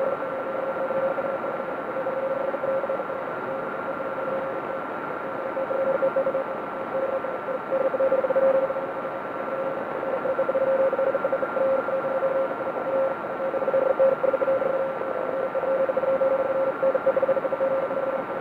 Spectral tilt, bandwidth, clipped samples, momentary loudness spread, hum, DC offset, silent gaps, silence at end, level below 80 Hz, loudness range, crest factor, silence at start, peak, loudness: -7.5 dB/octave; 4.6 kHz; under 0.1%; 8 LU; none; under 0.1%; none; 0 s; -66 dBFS; 4 LU; 14 dB; 0 s; -10 dBFS; -26 LUFS